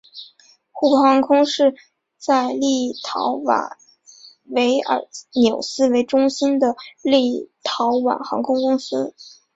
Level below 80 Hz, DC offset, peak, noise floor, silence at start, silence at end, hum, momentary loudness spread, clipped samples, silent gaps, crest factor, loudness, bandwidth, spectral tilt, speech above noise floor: -64 dBFS; under 0.1%; -4 dBFS; -52 dBFS; 0.15 s; 0.25 s; none; 11 LU; under 0.1%; none; 16 dB; -19 LUFS; 8 kHz; -3.5 dB/octave; 34 dB